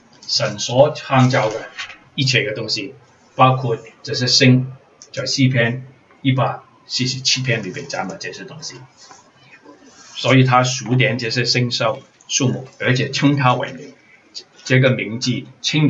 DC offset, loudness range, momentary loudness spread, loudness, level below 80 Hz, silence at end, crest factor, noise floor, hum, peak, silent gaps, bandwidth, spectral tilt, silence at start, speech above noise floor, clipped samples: under 0.1%; 4 LU; 17 LU; -17 LUFS; -62 dBFS; 0 s; 18 dB; -47 dBFS; none; 0 dBFS; none; 8 kHz; -4.5 dB/octave; 0.2 s; 30 dB; under 0.1%